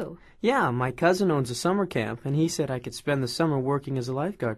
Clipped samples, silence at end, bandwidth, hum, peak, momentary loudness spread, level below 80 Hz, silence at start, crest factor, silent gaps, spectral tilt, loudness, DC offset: under 0.1%; 0 s; 13.5 kHz; none; -10 dBFS; 6 LU; -58 dBFS; 0 s; 16 dB; none; -6 dB/octave; -26 LUFS; under 0.1%